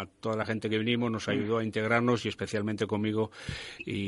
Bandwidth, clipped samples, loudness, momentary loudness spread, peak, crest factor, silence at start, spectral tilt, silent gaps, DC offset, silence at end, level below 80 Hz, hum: 11.5 kHz; under 0.1%; -30 LUFS; 9 LU; -10 dBFS; 20 dB; 0 s; -6 dB/octave; none; under 0.1%; 0 s; -58 dBFS; none